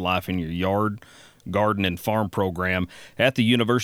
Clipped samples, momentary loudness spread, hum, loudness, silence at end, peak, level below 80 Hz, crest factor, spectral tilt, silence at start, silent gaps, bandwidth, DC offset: under 0.1%; 8 LU; none; -24 LUFS; 0 s; -6 dBFS; -52 dBFS; 18 dB; -6 dB/octave; 0 s; none; 19 kHz; under 0.1%